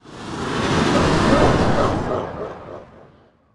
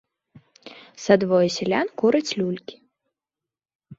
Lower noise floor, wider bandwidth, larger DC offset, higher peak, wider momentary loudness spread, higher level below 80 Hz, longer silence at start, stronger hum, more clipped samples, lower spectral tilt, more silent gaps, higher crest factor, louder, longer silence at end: second, -52 dBFS vs -89 dBFS; first, 12 kHz vs 8 kHz; neither; about the same, -4 dBFS vs -2 dBFS; about the same, 18 LU vs 16 LU; first, -34 dBFS vs -66 dBFS; second, 0.05 s vs 0.65 s; neither; neither; about the same, -5.5 dB/octave vs -5.5 dB/octave; second, none vs 3.75-3.79 s; second, 16 dB vs 22 dB; about the same, -19 LUFS vs -21 LUFS; first, 0.5 s vs 0.05 s